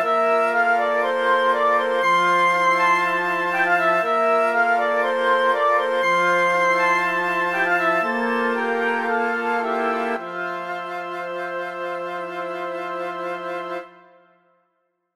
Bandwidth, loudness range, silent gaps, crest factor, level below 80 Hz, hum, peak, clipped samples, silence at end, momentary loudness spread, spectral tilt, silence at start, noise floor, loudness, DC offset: 15.5 kHz; 10 LU; none; 14 dB; -74 dBFS; none; -8 dBFS; under 0.1%; 1.25 s; 11 LU; -4 dB/octave; 0 s; -71 dBFS; -20 LUFS; under 0.1%